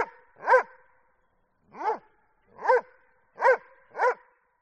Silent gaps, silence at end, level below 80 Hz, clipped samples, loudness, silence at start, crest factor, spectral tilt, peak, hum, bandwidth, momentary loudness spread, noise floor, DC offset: none; 0.45 s; -76 dBFS; under 0.1%; -26 LUFS; 0 s; 20 dB; -3 dB/octave; -8 dBFS; none; 8.6 kHz; 15 LU; -70 dBFS; under 0.1%